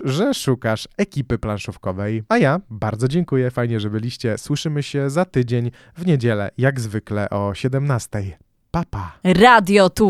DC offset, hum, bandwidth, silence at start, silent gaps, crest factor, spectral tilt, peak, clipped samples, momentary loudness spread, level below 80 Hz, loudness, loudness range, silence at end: under 0.1%; none; 15 kHz; 0 s; none; 18 dB; -6 dB/octave; 0 dBFS; under 0.1%; 11 LU; -44 dBFS; -20 LUFS; 4 LU; 0 s